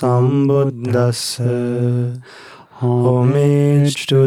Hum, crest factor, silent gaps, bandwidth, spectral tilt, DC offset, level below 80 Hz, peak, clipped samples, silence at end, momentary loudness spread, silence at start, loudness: none; 12 dB; none; 14 kHz; -7 dB/octave; under 0.1%; -60 dBFS; -4 dBFS; under 0.1%; 0 s; 7 LU; 0 s; -16 LUFS